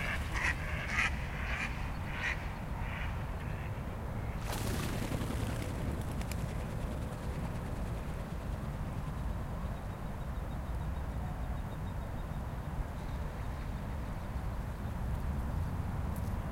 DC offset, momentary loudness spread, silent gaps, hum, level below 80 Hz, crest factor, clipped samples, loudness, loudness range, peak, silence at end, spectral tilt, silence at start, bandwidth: under 0.1%; 6 LU; none; none; -40 dBFS; 20 dB; under 0.1%; -38 LUFS; 4 LU; -16 dBFS; 0 s; -5.5 dB/octave; 0 s; 16 kHz